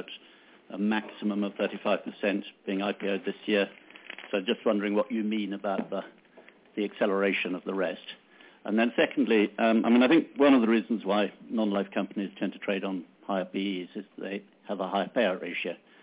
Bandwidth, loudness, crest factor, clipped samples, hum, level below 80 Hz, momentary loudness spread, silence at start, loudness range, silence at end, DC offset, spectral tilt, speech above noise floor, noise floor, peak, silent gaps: 4 kHz; -28 LUFS; 18 dB; under 0.1%; none; -78 dBFS; 16 LU; 0 s; 7 LU; 0.25 s; under 0.1%; -4 dB/octave; 28 dB; -56 dBFS; -10 dBFS; none